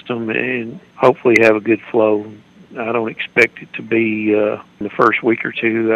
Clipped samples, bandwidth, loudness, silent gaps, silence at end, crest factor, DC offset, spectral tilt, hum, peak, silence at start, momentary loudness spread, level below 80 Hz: under 0.1%; 10 kHz; -16 LUFS; none; 0 s; 16 dB; under 0.1%; -6 dB/octave; none; 0 dBFS; 0.05 s; 14 LU; -60 dBFS